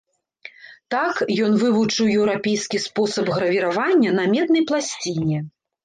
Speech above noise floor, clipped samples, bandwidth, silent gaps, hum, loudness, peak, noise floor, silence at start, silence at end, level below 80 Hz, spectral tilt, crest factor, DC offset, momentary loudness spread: 26 dB; under 0.1%; 9.6 kHz; none; none; -20 LUFS; -8 dBFS; -45 dBFS; 0.45 s; 0.35 s; -60 dBFS; -5 dB/octave; 12 dB; under 0.1%; 7 LU